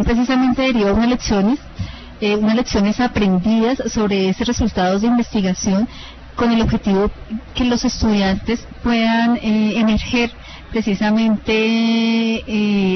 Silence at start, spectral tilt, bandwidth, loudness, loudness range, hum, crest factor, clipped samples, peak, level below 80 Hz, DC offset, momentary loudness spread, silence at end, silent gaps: 0 s; -5.5 dB/octave; 6.4 kHz; -17 LUFS; 1 LU; none; 12 dB; under 0.1%; -4 dBFS; -32 dBFS; under 0.1%; 7 LU; 0 s; none